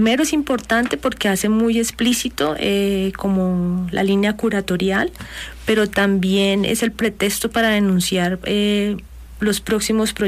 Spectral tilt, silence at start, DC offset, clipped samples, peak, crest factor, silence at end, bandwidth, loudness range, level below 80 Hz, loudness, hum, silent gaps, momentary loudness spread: -4.5 dB/octave; 0 s; under 0.1%; under 0.1%; -6 dBFS; 12 dB; 0 s; 15.5 kHz; 2 LU; -42 dBFS; -19 LUFS; none; none; 5 LU